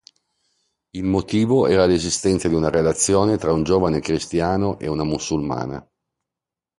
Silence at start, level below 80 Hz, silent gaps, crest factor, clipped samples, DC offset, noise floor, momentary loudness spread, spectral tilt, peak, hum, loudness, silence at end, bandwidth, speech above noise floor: 0.95 s; -42 dBFS; none; 18 dB; under 0.1%; under 0.1%; -87 dBFS; 9 LU; -5 dB/octave; -4 dBFS; none; -20 LUFS; 1 s; 11.5 kHz; 68 dB